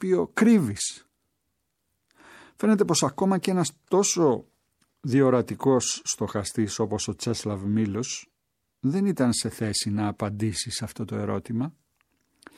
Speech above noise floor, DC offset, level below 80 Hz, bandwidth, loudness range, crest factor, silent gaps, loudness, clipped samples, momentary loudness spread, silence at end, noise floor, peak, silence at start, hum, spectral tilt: 54 dB; under 0.1%; -60 dBFS; 15 kHz; 4 LU; 20 dB; none; -25 LUFS; under 0.1%; 10 LU; 0.85 s; -79 dBFS; -6 dBFS; 0 s; none; -5 dB/octave